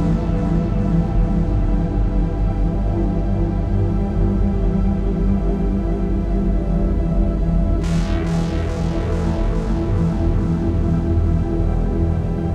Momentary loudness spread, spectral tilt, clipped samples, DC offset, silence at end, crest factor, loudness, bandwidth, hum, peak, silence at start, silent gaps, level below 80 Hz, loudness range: 2 LU; -9 dB/octave; under 0.1%; under 0.1%; 0 s; 12 dB; -20 LUFS; 7.8 kHz; none; -6 dBFS; 0 s; none; -20 dBFS; 1 LU